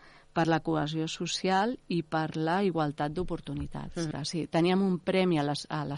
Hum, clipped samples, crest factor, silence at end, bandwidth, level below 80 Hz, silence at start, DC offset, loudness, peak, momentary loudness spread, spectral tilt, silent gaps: none; under 0.1%; 16 dB; 0 s; 11.5 kHz; -52 dBFS; 0.05 s; under 0.1%; -30 LUFS; -14 dBFS; 9 LU; -5.5 dB/octave; none